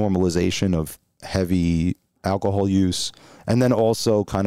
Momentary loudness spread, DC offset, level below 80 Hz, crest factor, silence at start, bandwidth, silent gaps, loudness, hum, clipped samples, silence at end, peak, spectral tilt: 10 LU; 0.4%; -42 dBFS; 16 dB; 0 s; 15.5 kHz; none; -22 LUFS; none; under 0.1%; 0 s; -6 dBFS; -6 dB/octave